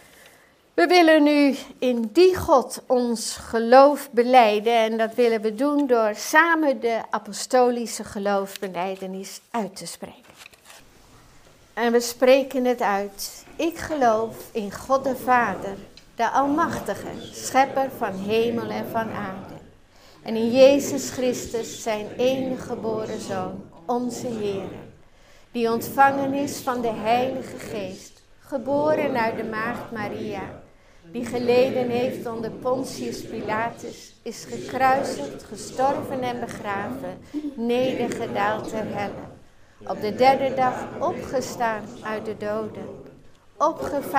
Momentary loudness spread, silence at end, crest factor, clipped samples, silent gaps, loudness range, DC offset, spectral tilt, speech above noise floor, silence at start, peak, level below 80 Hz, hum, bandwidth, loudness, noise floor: 16 LU; 0 s; 22 dB; under 0.1%; none; 9 LU; under 0.1%; -4.5 dB/octave; 32 dB; 0.75 s; 0 dBFS; -56 dBFS; none; 16 kHz; -23 LUFS; -54 dBFS